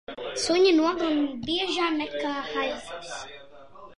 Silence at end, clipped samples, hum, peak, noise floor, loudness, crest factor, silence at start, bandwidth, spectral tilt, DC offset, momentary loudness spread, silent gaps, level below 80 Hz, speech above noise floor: 0.05 s; under 0.1%; none; -10 dBFS; -48 dBFS; -25 LUFS; 16 dB; 0.1 s; 11 kHz; -3 dB/octave; 0.3%; 16 LU; none; -60 dBFS; 23 dB